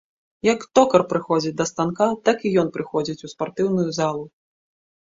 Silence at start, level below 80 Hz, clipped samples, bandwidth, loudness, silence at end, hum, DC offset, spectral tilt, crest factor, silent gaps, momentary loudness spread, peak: 0.45 s; -62 dBFS; under 0.1%; 7.8 kHz; -21 LUFS; 0.85 s; none; under 0.1%; -5.5 dB/octave; 20 dB; none; 11 LU; -2 dBFS